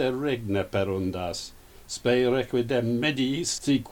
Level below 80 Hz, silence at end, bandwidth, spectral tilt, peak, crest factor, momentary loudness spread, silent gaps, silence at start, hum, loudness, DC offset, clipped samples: -52 dBFS; 0 s; 18.5 kHz; -5 dB/octave; -10 dBFS; 16 dB; 9 LU; none; 0 s; none; -26 LUFS; under 0.1%; under 0.1%